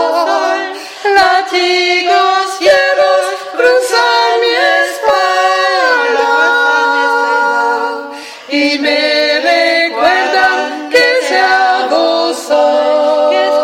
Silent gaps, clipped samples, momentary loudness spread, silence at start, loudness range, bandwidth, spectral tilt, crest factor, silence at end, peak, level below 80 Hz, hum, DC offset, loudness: none; under 0.1%; 5 LU; 0 s; 1 LU; 16.5 kHz; -1 dB/octave; 10 dB; 0 s; 0 dBFS; -58 dBFS; none; under 0.1%; -10 LUFS